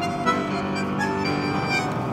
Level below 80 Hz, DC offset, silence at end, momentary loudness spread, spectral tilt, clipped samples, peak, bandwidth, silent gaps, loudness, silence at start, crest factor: -50 dBFS; under 0.1%; 0 s; 3 LU; -5.5 dB/octave; under 0.1%; -8 dBFS; 16 kHz; none; -24 LUFS; 0 s; 16 dB